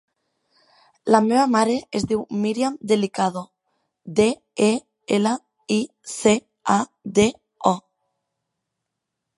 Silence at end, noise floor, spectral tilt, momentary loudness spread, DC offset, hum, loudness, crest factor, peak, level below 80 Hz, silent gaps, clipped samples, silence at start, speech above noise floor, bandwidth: 1.6 s; -81 dBFS; -5 dB/octave; 7 LU; under 0.1%; none; -22 LUFS; 22 dB; 0 dBFS; -58 dBFS; none; under 0.1%; 1.05 s; 61 dB; 11.5 kHz